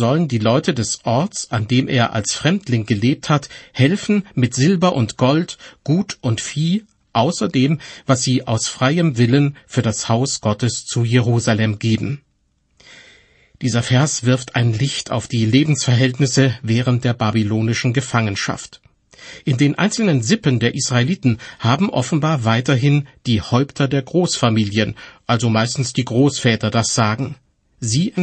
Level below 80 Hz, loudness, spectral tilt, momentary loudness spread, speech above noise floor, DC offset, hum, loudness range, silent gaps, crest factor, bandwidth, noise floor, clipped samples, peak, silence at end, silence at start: -50 dBFS; -18 LUFS; -5 dB/octave; 6 LU; 46 dB; under 0.1%; none; 3 LU; none; 16 dB; 8.8 kHz; -63 dBFS; under 0.1%; -2 dBFS; 0 s; 0 s